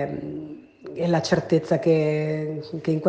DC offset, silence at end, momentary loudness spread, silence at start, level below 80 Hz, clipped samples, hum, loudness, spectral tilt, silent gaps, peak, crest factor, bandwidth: under 0.1%; 0 s; 16 LU; 0 s; -60 dBFS; under 0.1%; none; -24 LUFS; -7 dB/octave; none; -6 dBFS; 18 dB; 8.8 kHz